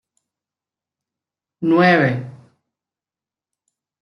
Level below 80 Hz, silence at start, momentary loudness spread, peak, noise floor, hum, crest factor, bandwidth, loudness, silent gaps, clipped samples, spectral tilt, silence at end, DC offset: -66 dBFS; 1.6 s; 16 LU; -2 dBFS; under -90 dBFS; none; 20 dB; 10.5 kHz; -16 LUFS; none; under 0.1%; -8 dB/octave; 1.7 s; under 0.1%